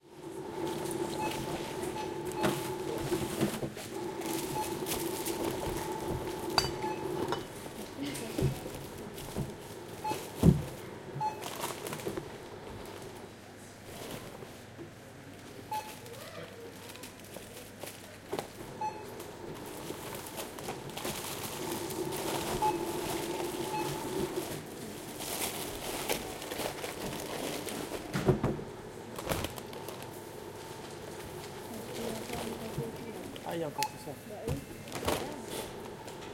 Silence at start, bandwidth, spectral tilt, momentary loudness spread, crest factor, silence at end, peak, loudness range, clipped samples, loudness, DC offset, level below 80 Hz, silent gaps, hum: 0.05 s; 17 kHz; -4.5 dB/octave; 13 LU; 28 dB; 0 s; -8 dBFS; 10 LU; under 0.1%; -37 LUFS; under 0.1%; -56 dBFS; none; none